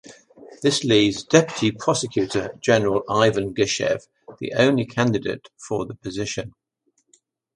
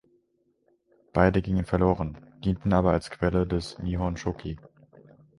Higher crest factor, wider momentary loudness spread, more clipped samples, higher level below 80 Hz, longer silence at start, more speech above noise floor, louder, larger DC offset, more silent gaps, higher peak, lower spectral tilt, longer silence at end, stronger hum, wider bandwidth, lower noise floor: about the same, 22 dB vs 22 dB; about the same, 12 LU vs 11 LU; neither; second, -54 dBFS vs -40 dBFS; second, 0.05 s vs 1.15 s; about the same, 48 dB vs 45 dB; first, -21 LUFS vs -27 LUFS; neither; neither; first, 0 dBFS vs -6 dBFS; second, -4.5 dB/octave vs -8 dB/octave; first, 1.05 s vs 0.8 s; neither; about the same, 11.5 kHz vs 11.5 kHz; about the same, -69 dBFS vs -71 dBFS